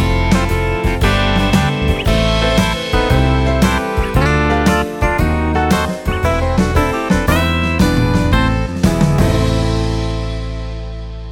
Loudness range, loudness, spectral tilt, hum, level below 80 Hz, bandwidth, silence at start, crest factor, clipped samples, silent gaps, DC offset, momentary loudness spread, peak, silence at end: 1 LU; -15 LUFS; -6 dB/octave; none; -20 dBFS; 17.5 kHz; 0 s; 14 dB; under 0.1%; none; under 0.1%; 6 LU; 0 dBFS; 0 s